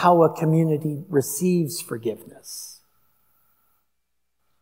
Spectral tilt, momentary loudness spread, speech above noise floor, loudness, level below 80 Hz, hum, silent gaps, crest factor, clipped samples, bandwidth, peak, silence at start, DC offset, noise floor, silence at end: -6.5 dB/octave; 18 LU; 57 dB; -22 LUFS; -74 dBFS; none; none; 20 dB; under 0.1%; 16 kHz; -4 dBFS; 0 s; under 0.1%; -79 dBFS; 1.9 s